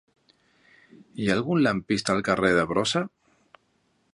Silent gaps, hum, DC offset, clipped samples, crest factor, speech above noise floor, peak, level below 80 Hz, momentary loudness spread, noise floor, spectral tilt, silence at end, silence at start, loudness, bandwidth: none; none; under 0.1%; under 0.1%; 20 dB; 45 dB; -8 dBFS; -56 dBFS; 8 LU; -69 dBFS; -5 dB/octave; 1.05 s; 1.15 s; -24 LUFS; 11.5 kHz